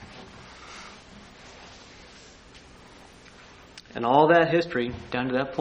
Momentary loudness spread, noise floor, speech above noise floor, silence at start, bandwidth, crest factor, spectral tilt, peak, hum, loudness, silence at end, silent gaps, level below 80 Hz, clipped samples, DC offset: 28 LU; -50 dBFS; 27 dB; 0 s; 9.6 kHz; 24 dB; -6 dB/octave; -4 dBFS; none; -23 LUFS; 0 s; none; -56 dBFS; under 0.1%; under 0.1%